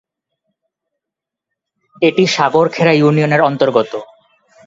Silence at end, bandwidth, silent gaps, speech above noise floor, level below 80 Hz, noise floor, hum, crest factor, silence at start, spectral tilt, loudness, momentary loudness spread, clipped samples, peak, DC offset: 0.6 s; 7.8 kHz; none; 71 dB; -60 dBFS; -83 dBFS; none; 16 dB; 2 s; -6 dB/octave; -13 LUFS; 5 LU; under 0.1%; 0 dBFS; under 0.1%